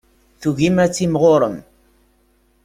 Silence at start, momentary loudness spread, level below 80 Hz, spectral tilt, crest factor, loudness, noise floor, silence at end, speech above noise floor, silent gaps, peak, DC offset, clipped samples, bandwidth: 0.4 s; 10 LU; -50 dBFS; -6 dB/octave; 16 dB; -17 LUFS; -59 dBFS; 1.05 s; 43 dB; none; -2 dBFS; under 0.1%; under 0.1%; 15.5 kHz